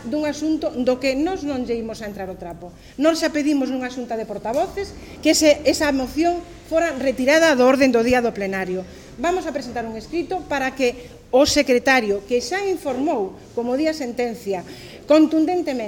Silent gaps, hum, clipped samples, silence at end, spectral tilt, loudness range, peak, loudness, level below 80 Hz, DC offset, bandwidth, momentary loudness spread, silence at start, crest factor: none; none; under 0.1%; 0 s; -3.5 dB/octave; 6 LU; -4 dBFS; -20 LUFS; -46 dBFS; under 0.1%; 17 kHz; 14 LU; 0 s; 16 dB